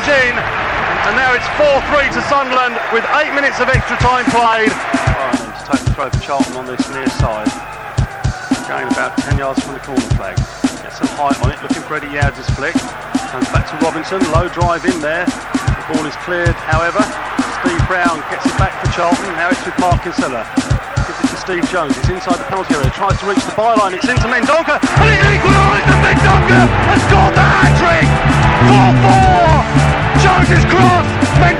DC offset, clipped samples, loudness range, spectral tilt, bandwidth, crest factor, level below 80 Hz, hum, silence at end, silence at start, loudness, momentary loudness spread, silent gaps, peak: 0.2%; under 0.1%; 9 LU; -5.5 dB/octave; 12.5 kHz; 12 dB; -24 dBFS; none; 0 s; 0 s; -13 LUFS; 10 LU; none; 0 dBFS